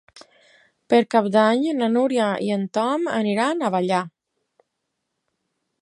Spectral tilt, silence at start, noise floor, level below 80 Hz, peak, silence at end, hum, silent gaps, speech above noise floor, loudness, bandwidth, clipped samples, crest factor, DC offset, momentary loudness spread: -6 dB/octave; 0.9 s; -78 dBFS; -74 dBFS; -4 dBFS; 1.75 s; none; none; 58 dB; -21 LUFS; 11.5 kHz; under 0.1%; 18 dB; under 0.1%; 6 LU